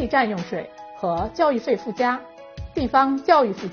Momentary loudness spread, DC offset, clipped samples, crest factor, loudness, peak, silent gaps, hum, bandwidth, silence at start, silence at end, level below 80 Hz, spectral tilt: 14 LU; under 0.1%; under 0.1%; 20 dB; -22 LUFS; -2 dBFS; none; none; 6.8 kHz; 0 s; 0 s; -44 dBFS; -4 dB/octave